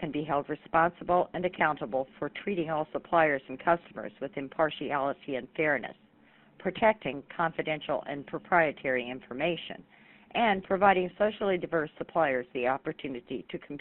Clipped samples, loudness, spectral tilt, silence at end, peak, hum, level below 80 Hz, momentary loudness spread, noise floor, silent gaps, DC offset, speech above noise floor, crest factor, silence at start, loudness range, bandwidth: under 0.1%; -30 LUFS; -3.5 dB/octave; 0 s; -8 dBFS; none; -64 dBFS; 12 LU; -61 dBFS; none; under 0.1%; 31 dB; 22 dB; 0 s; 3 LU; 4.2 kHz